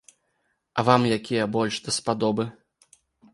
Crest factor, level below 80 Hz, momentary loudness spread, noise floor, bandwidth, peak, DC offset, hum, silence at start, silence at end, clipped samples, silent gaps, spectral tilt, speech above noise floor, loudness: 24 dB; -62 dBFS; 9 LU; -73 dBFS; 11.5 kHz; -2 dBFS; under 0.1%; none; 0.75 s; 0.8 s; under 0.1%; none; -5 dB/octave; 50 dB; -24 LUFS